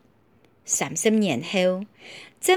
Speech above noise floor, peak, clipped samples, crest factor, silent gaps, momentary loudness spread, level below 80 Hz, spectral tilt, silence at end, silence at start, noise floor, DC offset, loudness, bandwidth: 36 dB; -6 dBFS; under 0.1%; 18 dB; none; 21 LU; -72 dBFS; -3.5 dB/octave; 0 s; 0.65 s; -60 dBFS; under 0.1%; -23 LUFS; over 20 kHz